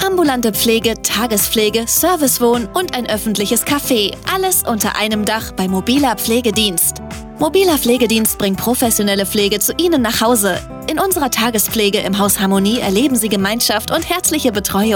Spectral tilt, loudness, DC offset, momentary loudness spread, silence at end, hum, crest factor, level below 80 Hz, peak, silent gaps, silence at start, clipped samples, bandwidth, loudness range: -3 dB/octave; -14 LUFS; under 0.1%; 5 LU; 0 s; none; 12 dB; -38 dBFS; -2 dBFS; none; 0 s; under 0.1%; 19 kHz; 1 LU